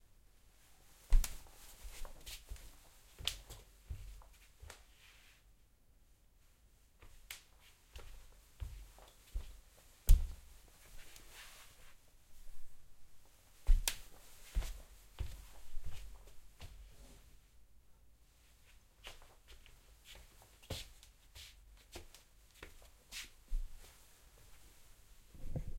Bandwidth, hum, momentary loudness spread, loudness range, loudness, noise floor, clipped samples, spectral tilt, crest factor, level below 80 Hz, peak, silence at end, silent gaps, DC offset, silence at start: 16.5 kHz; none; 25 LU; 17 LU; -46 LUFS; -67 dBFS; under 0.1%; -3 dB/octave; 28 dB; -42 dBFS; -14 dBFS; 0 s; none; under 0.1%; 1.1 s